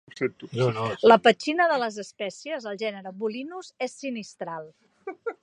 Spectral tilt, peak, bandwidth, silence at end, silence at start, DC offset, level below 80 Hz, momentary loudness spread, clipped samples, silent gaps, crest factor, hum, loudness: -5 dB/octave; -2 dBFS; 10.5 kHz; 0.1 s; 0.15 s; under 0.1%; -72 dBFS; 18 LU; under 0.1%; none; 24 dB; none; -25 LUFS